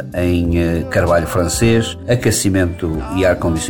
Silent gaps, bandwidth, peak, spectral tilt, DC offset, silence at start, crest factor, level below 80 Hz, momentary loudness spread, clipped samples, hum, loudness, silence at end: none; 19.5 kHz; -2 dBFS; -5.5 dB/octave; 0.7%; 0 s; 14 dB; -30 dBFS; 4 LU; under 0.1%; none; -16 LUFS; 0 s